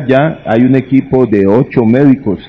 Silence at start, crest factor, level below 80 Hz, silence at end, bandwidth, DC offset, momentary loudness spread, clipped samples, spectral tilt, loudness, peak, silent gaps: 0 s; 10 dB; -40 dBFS; 0 s; 5.2 kHz; under 0.1%; 3 LU; 2%; -10 dB/octave; -10 LUFS; 0 dBFS; none